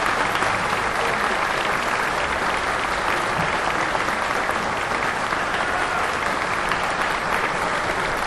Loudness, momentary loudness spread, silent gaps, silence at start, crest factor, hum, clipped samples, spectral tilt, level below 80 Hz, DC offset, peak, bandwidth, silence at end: -22 LUFS; 2 LU; none; 0 s; 18 dB; none; under 0.1%; -3 dB/octave; -42 dBFS; under 0.1%; -4 dBFS; 13 kHz; 0 s